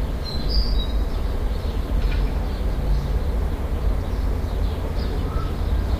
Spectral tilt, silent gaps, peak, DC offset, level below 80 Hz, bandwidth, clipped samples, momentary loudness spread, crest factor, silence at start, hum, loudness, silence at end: -7 dB/octave; none; -8 dBFS; under 0.1%; -22 dBFS; 15.5 kHz; under 0.1%; 3 LU; 14 dB; 0 s; none; -26 LUFS; 0 s